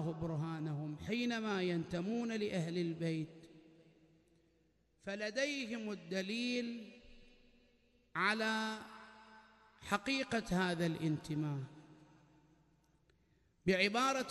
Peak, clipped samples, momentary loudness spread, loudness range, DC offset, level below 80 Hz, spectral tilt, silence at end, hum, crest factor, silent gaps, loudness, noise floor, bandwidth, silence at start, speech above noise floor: -18 dBFS; under 0.1%; 14 LU; 4 LU; under 0.1%; -68 dBFS; -5 dB/octave; 0 s; none; 22 dB; none; -38 LUFS; -75 dBFS; 12 kHz; 0 s; 37 dB